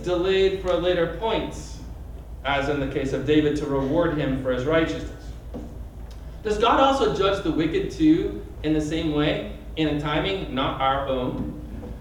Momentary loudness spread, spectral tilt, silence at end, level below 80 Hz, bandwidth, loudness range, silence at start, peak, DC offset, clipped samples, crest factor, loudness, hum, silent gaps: 17 LU; -6 dB/octave; 0 s; -38 dBFS; 12 kHz; 3 LU; 0 s; -6 dBFS; under 0.1%; under 0.1%; 18 dB; -23 LUFS; none; none